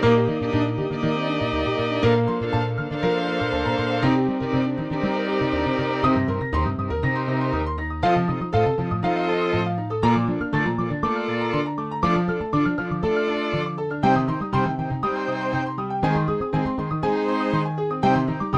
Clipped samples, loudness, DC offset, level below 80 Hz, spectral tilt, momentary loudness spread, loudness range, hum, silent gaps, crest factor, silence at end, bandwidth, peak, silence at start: under 0.1%; -23 LUFS; under 0.1%; -40 dBFS; -8 dB/octave; 5 LU; 1 LU; none; none; 18 dB; 0 s; 8.8 kHz; -4 dBFS; 0 s